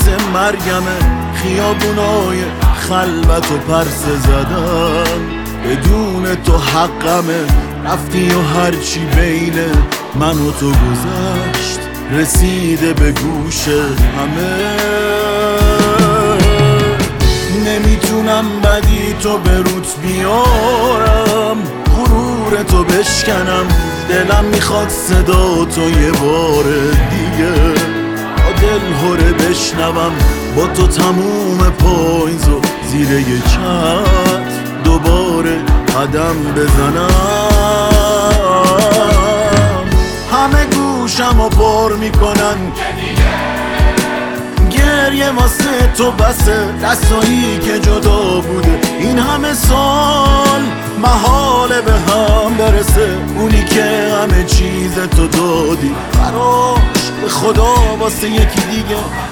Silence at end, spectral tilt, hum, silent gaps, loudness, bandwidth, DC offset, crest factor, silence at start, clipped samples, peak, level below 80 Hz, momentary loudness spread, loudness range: 0 s; -5 dB/octave; none; none; -12 LUFS; 18.5 kHz; under 0.1%; 12 dB; 0 s; under 0.1%; 0 dBFS; -16 dBFS; 5 LU; 3 LU